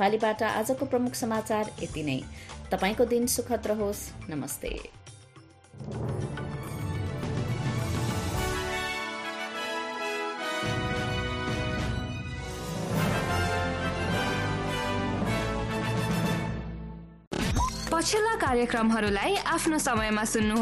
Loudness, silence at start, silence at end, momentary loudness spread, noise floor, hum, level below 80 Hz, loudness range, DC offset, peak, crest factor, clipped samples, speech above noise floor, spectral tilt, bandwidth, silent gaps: -29 LUFS; 0 s; 0 s; 11 LU; -53 dBFS; none; -42 dBFS; 6 LU; under 0.1%; -12 dBFS; 16 dB; under 0.1%; 26 dB; -4.5 dB/octave; 15 kHz; 17.27-17.31 s